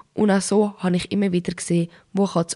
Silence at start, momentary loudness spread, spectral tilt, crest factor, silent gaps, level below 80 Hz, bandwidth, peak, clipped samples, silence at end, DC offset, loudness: 0.15 s; 5 LU; -5.5 dB/octave; 14 dB; none; -56 dBFS; 11.5 kHz; -8 dBFS; under 0.1%; 0 s; under 0.1%; -22 LUFS